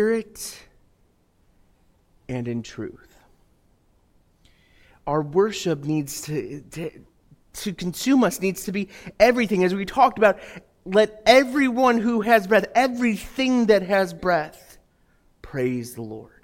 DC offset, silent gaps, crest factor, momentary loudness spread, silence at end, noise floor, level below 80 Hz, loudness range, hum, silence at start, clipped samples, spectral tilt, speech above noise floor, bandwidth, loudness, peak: under 0.1%; none; 22 dB; 18 LU; 0.2 s; -62 dBFS; -54 dBFS; 18 LU; none; 0 s; under 0.1%; -5 dB/octave; 41 dB; 17 kHz; -21 LUFS; 0 dBFS